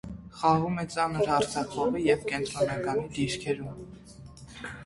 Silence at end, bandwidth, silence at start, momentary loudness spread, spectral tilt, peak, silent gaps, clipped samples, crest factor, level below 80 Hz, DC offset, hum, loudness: 0 s; 11.5 kHz; 0.05 s; 20 LU; -5.5 dB/octave; -10 dBFS; none; under 0.1%; 20 dB; -54 dBFS; under 0.1%; none; -28 LUFS